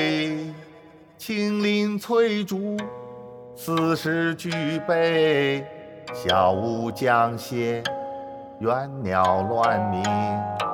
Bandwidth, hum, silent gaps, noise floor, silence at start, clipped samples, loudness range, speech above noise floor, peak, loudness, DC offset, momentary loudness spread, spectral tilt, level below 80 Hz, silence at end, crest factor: 19 kHz; none; none; -48 dBFS; 0 s; under 0.1%; 3 LU; 26 dB; -6 dBFS; -24 LUFS; under 0.1%; 16 LU; -5.5 dB/octave; -64 dBFS; 0 s; 18 dB